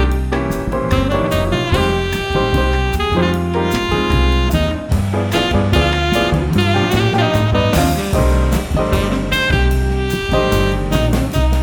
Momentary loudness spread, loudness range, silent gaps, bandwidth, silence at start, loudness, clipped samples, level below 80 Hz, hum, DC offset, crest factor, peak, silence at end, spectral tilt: 4 LU; 2 LU; none; 19.5 kHz; 0 s; -16 LUFS; under 0.1%; -20 dBFS; none; under 0.1%; 14 dB; -2 dBFS; 0 s; -6 dB/octave